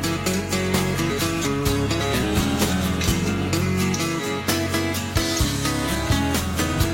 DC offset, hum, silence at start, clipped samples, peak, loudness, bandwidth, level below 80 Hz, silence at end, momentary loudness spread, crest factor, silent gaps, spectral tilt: under 0.1%; none; 0 s; under 0.1%; -6 dBFS; -22 LUFS; 16.5 kHz; -34 dBFS; 0 s; 2 LU; 16 dB; none; -4.5 dB/octave